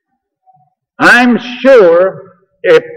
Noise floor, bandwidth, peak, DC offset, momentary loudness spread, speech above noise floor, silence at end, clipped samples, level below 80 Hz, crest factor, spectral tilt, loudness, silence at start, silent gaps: -55 dBFS; 15 kHz; 0 dBFS; under 0.1%; 8 LU; 48 dB; 0 s; 0.5%; -52 dBFS; 10 dB; -4.5 dB/octave; -8 LUFS; 1 s; none